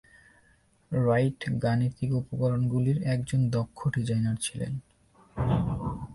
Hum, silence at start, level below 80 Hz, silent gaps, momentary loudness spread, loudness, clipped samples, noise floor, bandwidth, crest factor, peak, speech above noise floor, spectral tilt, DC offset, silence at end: none; 0.9 s; -48 dBFS; none; 8 LU; -28 LUFS; under 0.1%; -64 dBFS; 11.5 kHz; 16 dB; -12 dBFS; 37 dB; -7 dB/octave; under 0.1%; 0 s